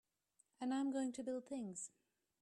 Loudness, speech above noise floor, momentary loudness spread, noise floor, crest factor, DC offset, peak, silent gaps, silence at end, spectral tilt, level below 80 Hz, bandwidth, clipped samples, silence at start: -44 LUFS; 37 dB; 9 LU; -80 dBFS; 14 dB; under 0.1%; -32 dBFS; none; 0.55 s; -4.5 dB/octave; -88 dBFS; 11 kHz; under 0.1%; 0.6 s